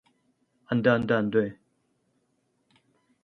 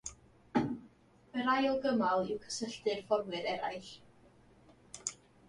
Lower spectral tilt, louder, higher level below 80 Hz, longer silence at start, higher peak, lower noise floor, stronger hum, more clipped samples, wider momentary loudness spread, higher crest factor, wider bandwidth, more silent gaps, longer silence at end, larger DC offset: first, -8.5 dB/octave vs -4 dB/octave; first, -25 LUFS vs -35 LUFS; about the same, -64 dBFS vs -68 dBFS; first, 0.7 s vs 0.05 s; first, -8 dBFS vs -16 dBFS; first, -73 dBFS vs -62 dBFS; neither; neither; second, 7 LU vs 16 LU; about the same, 22 dB vs 20 dB; second, 6.2 kHz vs 11.5 kHz; neither; first, 1.7 s vs 0.35 s; neither